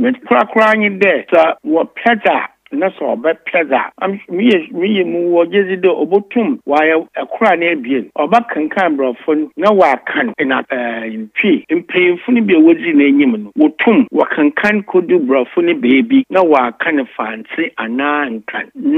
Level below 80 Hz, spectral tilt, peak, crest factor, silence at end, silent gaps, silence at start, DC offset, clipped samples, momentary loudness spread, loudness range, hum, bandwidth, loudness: -66 dBFS; -7 dB/octave; 0 dBFS; 14 dB; 0 s; none; 0 s; under 0.1%; under 0.1%; 8 LU; 3 LU; none; 7.2 kHz; -13 LUFS